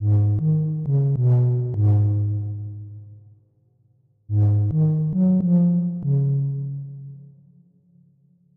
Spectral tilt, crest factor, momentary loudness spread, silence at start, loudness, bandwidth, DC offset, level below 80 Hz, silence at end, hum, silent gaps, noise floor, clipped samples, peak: -14 dB/octave; 12 dB; 16 LU; 0 s; -21 LUFS; 1.5 kHz; under 0.1%; -54 dBFS; 1.3 s; none; none; -61 dBFS; under 0.1%; -10 dBFS